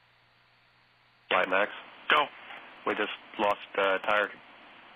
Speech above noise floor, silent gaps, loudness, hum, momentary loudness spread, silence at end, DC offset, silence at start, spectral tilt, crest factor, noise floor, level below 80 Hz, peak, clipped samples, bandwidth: 35 dB; none; -29 LUFS; none; 15 LU; 0.6 s; under 0.1%; 1.3 s; -4 dB/octave; 22 dB; -64 dBFS; -72 dBFS; -8 dBFS; under 0.1%; 19.5 kHz